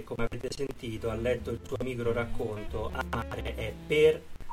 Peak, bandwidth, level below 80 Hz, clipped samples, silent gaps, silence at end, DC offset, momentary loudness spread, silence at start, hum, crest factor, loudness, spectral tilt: -12 dBFS; 16 kHz; -42 dBFS; under 0.1%; none; 0 s; under 0.1%; 12 LU; 0 s; none; 18 dB; -32 LUFS; -6 dB/octave